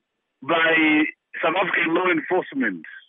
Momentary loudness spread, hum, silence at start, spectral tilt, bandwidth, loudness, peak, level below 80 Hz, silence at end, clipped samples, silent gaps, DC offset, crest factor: 9 LU; none; 0.4 s; -1.5 dB/octave; 3.8 kHz; -21 LUFS; -8 dBFS; -82 dBFS; 0.1 s; under 0.1%; none; under 0.1%; 14 dB